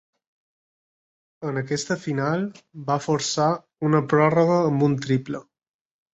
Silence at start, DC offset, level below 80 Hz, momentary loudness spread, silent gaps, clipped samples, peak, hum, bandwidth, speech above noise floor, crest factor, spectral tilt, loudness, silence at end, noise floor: 1.4 s; under 0.1%; -64 dBFS; 13 LU; none; under 0.1%; -6 dBFS; none; 8.2 kHz; over 68 dB; 18 dB; -6 dB/octave; -23 LUFS; 0.7 s; under -90 dBFS